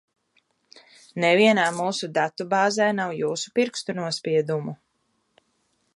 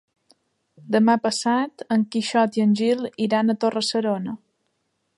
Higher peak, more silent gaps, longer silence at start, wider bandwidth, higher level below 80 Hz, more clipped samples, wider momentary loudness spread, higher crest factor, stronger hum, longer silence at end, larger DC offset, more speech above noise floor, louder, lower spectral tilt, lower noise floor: about the same, -6 dBFS vs -6 dBFS; neither; first, 1.15 s vs 0.85 s; about the same, 11.5 kHz vs 11.5 kHz; about the same, -74 dBFS vs -74 dBFS; neither; first, 11 LU vs 6 LU; about the same, 20 dB vs 16 dB; neither; first, 1.2 s vs 0.8 s; neither; about the same, 49 dB vs 52 dB; about the same, -23 LUFS vs -22 LUFS; about the same, -4.5 dB/octave vs -5 dB/octave; about the same, -71 dBFS vs -73 dBFS